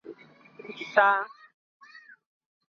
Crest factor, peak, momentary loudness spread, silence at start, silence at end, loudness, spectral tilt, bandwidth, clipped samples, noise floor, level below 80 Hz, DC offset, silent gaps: 24 dB; -6 dBFS; 25 LU; 0.1 s; 1.4 s; -24 LUFS; -3.5 dB/octave; 7 kHz; under 0.1%; -52 dBFS; -88 dBFS; under 0.1%; none